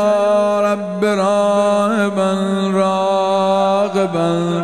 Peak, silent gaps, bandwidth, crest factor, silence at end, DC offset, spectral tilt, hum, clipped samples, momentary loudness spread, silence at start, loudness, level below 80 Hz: -4 dBFS; none; 12.5 kHz; 12 dB; 0 s; 0.3%; -6 dB/octave; none; under 0.1%; 3 LU; 0 s; -16 LUFS; -66 dBFS